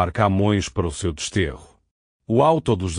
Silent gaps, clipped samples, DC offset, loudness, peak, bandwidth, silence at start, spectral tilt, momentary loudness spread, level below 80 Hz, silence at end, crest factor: 1.91-2.19 s; under 0.1%; under 0.1%; -21 LUFS; -4 dBFS; 10.5 kHz; 0 s; -6 dB/octave; 8 LU; -40 dBFS; 0 s; 16 dB